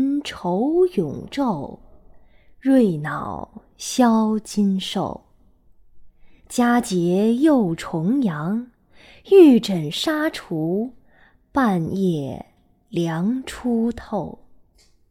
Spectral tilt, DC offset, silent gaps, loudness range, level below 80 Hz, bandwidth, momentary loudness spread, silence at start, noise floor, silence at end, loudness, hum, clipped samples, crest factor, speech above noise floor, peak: -6 dB/octave; under 0.1%; none; 6 LU; -52 dBFS; 16 kHz; 13 LU; 0 s; -56 dBFS; 0.8 s; -20 LUFS; none; under 0.1%; 20 dB; 36 dB; -2 dBFS